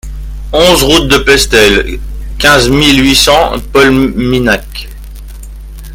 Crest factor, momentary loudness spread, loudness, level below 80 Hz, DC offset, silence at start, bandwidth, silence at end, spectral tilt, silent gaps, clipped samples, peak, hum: 10 dB; 19 LU; -7 LUFS; -20 dBFS; under 0.1%; 0.05 s; over 20 kHz; 0 s; -3.5 dB/octave; none; 1%; 0 dBFS; none